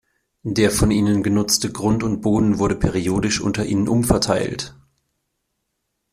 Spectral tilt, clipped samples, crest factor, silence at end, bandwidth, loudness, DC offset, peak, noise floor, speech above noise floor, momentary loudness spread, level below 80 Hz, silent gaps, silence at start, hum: -5 dB/octave; under 0.1%; 18 dB; 1.4 s; 15.5 kHz; -19 LUFS; under 0.1%; -2 dBFS; -75 dBFS; 56 dB; 6 LU; -38 dBFS; none; 0.45 s; none